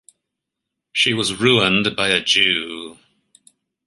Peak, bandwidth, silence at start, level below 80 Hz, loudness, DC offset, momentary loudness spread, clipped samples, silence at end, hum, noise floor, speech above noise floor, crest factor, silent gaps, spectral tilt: -2 dBFS; 11.5 kHz; 0.95 s; -56 dBFS; -16 LUFS; under 0.1%; 15 LU; under 0.1%; 0.95 s; none; -81 dBFS; 63 dB; 20 dB; none; -3 dB/octave